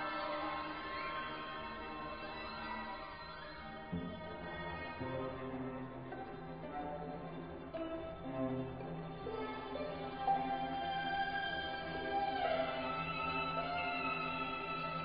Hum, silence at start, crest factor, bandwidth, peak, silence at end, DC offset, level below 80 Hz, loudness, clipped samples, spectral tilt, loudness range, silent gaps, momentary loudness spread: none; 0 s; 18 dB; 5 kHz; -24 dBFS; 0 s; under 0.1%; -60 dBFS; -41 LUFS; under 0.1%; -3 dB/octave; 7 LU; none; 10 LU